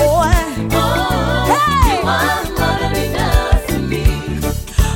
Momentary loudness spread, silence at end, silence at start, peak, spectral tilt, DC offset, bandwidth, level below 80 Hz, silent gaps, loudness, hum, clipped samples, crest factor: 6 LU; 0 s; 0 s; 0 dBFS; -5 dB/octave; under 0.1%; 17 kHz; -20 dBFS; none; -16 LUFS; none; under 0.1%; 14 dB